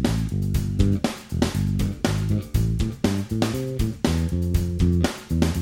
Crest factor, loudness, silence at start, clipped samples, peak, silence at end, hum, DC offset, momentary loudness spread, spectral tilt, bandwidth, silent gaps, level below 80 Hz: 18 dB; -24 LUFS; 0 s; under 0.1%; -6 dBFS; 0 s; none; under 0.1%; 3 LU; -6.5 dB/octave; 17 kHz; none; -30 dBFS